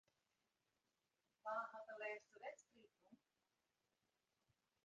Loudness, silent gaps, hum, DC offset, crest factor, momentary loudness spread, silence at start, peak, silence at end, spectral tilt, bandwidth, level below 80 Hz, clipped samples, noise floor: -52 LUFS; none; none; under 0.1%; 22 dB; 9 LU; 1.45 s; -36 dBFS; 1.7 s; -2.5 dB/octave; 8.2 kHz; under -90 dBFS; under 0.1%; under -90 dBFS